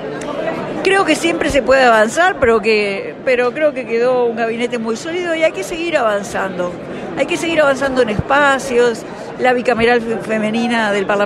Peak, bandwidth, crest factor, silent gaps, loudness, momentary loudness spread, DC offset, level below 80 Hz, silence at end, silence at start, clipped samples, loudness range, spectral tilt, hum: -2 dBFS; 13 kHz; 14 dB; none; -15 LUFS; 9 LU; under 0.1%; -44 dBFS; 0 s; 0 s; under 0.1%; 4 LU; -4 dB/octave; none